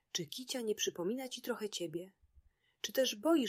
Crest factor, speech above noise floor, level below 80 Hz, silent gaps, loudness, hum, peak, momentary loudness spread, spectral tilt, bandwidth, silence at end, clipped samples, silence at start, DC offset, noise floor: 18 dB; 32 dB; -76 dBFS; none; -38 LUFS; none; -20 dBFS; 10 LU; -3 dB/octave; 16 kHz; 0 s; under 0.1%; 0.15 s; under 0.1%; -69 dBFS